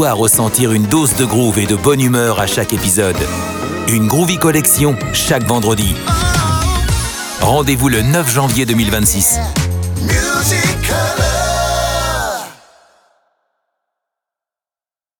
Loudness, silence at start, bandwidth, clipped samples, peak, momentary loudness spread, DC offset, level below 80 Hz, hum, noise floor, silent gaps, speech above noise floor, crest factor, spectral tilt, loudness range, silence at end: -13 LUFS; 0 s; over 20 kHz; under 0.1%; 0 dBFS; 7 LU; under 0.1%; -26 dBFS; none; under -90 dBFS; none; over 77 dB; 14 dB; -4 dB/octave; 5 LU; 2.65 s